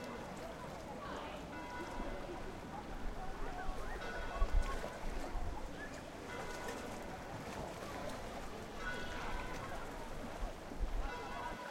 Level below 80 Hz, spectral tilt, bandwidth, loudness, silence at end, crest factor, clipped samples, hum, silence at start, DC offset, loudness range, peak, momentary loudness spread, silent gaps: -46 dBFS; -5 dB/octave; 16 kHz; -45 LUFS; 0 s; 20 dB; under 0.1%; none; 0 s; under 0.1%; 2 LU; -22 dBFS; 4 LU; none